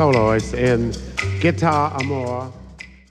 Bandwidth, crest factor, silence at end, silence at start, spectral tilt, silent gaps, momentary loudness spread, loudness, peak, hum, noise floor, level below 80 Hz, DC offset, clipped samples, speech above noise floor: 11.5 kHz; 16 dB; 0.2 s; 0 s; -6.5 dB/octave; none; 19 LU; -20 LUFS; -4 dBFS; none; -40 dBFS; -38 dBFS; under 0.1%; under 0.1%; 21 dB